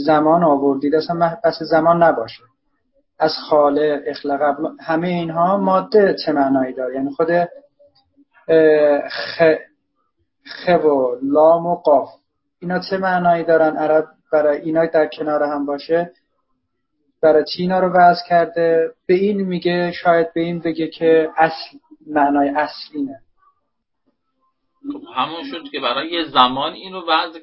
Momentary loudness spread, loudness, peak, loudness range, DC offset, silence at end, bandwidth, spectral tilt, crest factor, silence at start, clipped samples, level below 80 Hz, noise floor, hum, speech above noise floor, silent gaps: 11 LU; -17 LUFS; 0 dBFS; 5 LU; under 0.1%; 0.05 s; 5.8 kHz; -10 dB/octave; 18 dB; 0 s; under 0.1%; -60 dBFS; -74 dBFS; none; 57 dB; none